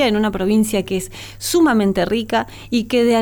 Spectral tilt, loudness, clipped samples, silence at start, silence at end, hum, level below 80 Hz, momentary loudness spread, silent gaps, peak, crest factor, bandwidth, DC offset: -4.5 dB/octave; -18 LUFS; under 0.1%; 0 s; 0 s; none; -42 dBFS; 9 LU; none; -6 dBFS; 12 dB; 19.5 kHz; under 0.1%